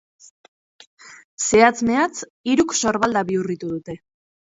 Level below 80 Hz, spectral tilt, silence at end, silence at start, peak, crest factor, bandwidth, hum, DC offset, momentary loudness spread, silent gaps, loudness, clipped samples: -54 dBFS; -3.5 dB/octave; 0.55 s; 1.05 s; -2 dBFS; 20 dB; 8 kHz; none; under 0.1%; 15 LU; 1.24-1.37 s, 2.30-2.44 s; -20 LUFS; under 0.1%